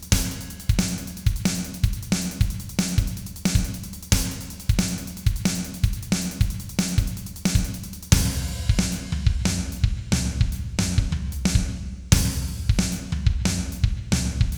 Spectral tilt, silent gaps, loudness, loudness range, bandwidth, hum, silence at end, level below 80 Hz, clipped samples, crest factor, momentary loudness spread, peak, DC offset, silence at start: -4.5 dB/octave; none; -25 LUFS; 2 LU; over 20 kHz; none; 0 s; -28 dBFS; under 0.1%; 22 dB; 6 LU; -2 dBFS; under 0.1%; 0 s